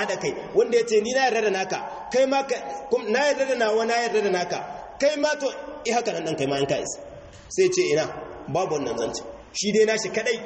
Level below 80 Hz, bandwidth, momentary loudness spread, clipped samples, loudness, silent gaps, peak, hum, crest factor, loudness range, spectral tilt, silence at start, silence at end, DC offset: -58 dBFS; 8.6 kHz; 10 LU; under 0.1%; -24 LUFS; none; -8 dBFS; none; 16 dB; 3 LU; -3.5 dB/octave; 0 s; 0 s; under 0.1%